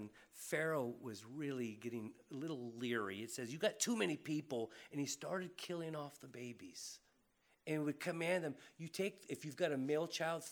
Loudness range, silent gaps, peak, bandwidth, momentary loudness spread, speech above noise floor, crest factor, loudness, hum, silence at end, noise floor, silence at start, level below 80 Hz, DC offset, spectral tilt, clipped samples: 4 LU; none; -24 dBFS; over 20 kHz; 13 LU; 35 dB; 20 dB; -43 LUFS; none; 0 s; -77 dBFS; 0 s; under -90 dBFS; under 0.1%; -4 dB/octave; under 0.1%